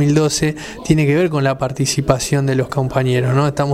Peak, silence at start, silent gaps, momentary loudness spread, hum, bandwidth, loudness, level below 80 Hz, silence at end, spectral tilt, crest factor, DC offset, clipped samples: 0 dBFS; 0 s; none; 4 LU; none; 15.5 kHz; -16 LUFS; -38 dBFS; 0 s; -5.5 dB/octave; 16 dB; under 0.1%; under 0.1%